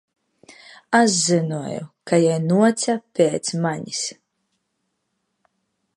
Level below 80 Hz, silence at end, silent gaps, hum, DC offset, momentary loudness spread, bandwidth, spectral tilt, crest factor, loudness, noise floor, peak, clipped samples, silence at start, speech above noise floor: -68 dBFS; 1.85 s; none; none; under 0.1%; 11 LU; 11.5 kHz; -4.5 dB/octave; 20 dB; -20 LUFS; -75 dBFS; -2 dBFS; under 0.1%; 0.9 s; 55 dB